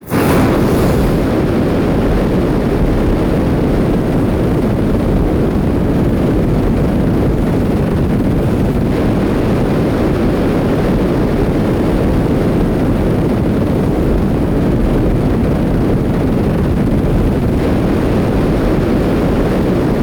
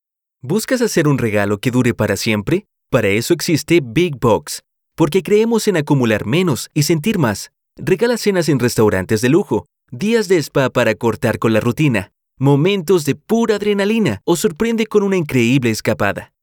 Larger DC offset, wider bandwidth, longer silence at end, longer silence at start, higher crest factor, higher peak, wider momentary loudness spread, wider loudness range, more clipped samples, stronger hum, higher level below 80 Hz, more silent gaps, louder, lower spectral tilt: neither; about the same, over 20 kHz vs 20 kHz; second, 0 s vs 0.2 s; second, 0 s vs 0.45 s; second, 6 dB vs 14 dB; second, -6 dBFS vs -2 dBFS; second, 1 LU vs 6 LU; about the same, 0 LU vs 1 LU; neither; neither; first, -20 dBFS vs -48 dBFS; neither; about the same, -14 LUFS vs -16 LUFS; first, -8 dB/octave vs -5.5 dB/octave